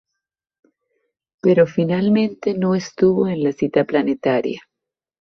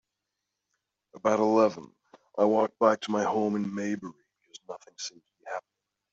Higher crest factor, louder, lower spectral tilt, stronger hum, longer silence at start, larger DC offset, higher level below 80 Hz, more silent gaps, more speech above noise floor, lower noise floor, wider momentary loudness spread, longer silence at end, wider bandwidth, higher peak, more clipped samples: second, 16 dB vs 22 dB; first, -18 LUFS vs -27 LUFS; first, -7.5 dB/octave vs -5.5 dB/octave; neither; first, 1.45 s vs 1.15 s; neither; first, -60 dBFS vs -76 dBFS; neither; first, 67 dB vs 58 dB; about the same, -84 dBFS vs -85 dBFS; second, 6 LU vs 20 LU; about the same, 0.6 s vs 0.55 s; second, 6.6 kHz vs 8 kHz; first, -2 dBFS vs -8 dBFS; neither